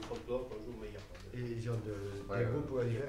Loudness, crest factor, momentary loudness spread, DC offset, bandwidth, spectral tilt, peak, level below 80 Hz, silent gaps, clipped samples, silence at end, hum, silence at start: -40 LUFS; 16 dB; 12 LU; under 0.1%; 12.5 kHz; -7.5 dB/octave; -24 dBFS; -54 dBFS; none; under 0.1%; 0 s; none; 0 s